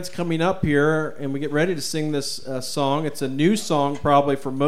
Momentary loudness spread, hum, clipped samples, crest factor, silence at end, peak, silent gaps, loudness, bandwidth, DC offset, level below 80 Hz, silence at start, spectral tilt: 9 LU; none; under 0.1%; 18 dB; 0 s; -4 dBFS; none; -22 LUFS; 15.5 kHz; 2%; -48 dBFS; 0 s; -5.5 dB/octave